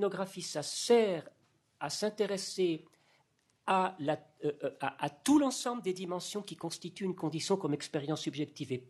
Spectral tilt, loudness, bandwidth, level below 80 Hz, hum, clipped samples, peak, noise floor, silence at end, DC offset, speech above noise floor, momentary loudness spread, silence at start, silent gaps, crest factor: -4.5 dB/octave; -34 LUFS; 12.5 kHz; -78 dBFS; none; under 0.1%; -14 dBFS; -73 dBFS; 0.05 s; under 0.1%; 40 dB; 12 LU; 0 s; none; 20 dB